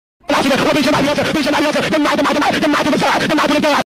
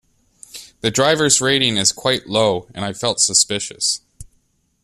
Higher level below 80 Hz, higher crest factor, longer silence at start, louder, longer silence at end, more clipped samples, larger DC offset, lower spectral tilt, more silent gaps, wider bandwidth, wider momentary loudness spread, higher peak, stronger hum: first, -44 dBFS vs -52 dBFS; second, 8 dB vs 20 dB; second, 0.3 s vs 0.55 s; about the same, -14 LUFS vs -16 LUFS; second, 0.05 s vs 0.6 s; neither; neither; first, -4 dB/octave vs -2 dB/octave; neither; first, 16 kHz vs 14.5 kHz; second, 2 LU vs 13 LU; second, -6 dBFS vs 0 dBFS; neither